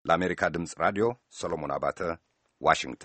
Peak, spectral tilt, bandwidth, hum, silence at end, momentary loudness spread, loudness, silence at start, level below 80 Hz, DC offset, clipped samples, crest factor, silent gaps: -6 dBFS; -4.5 dB/octave; 8.8 kHz; none; 0 s; 9 LU; -29 LUFS; 0.05 s; -56 dBFS; under 0.1%; under 0.1%; 24 dB; none